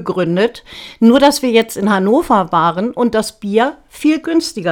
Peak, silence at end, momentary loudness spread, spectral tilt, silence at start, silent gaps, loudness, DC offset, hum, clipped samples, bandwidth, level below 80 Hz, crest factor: 0 dBFS; 0 s; 7 LU; -5 dB/octave; 0 s; none; -14 LUFS; under 0.1%; none; under 0.1%; 17.5 kHz; -46 dBFS; 14 dB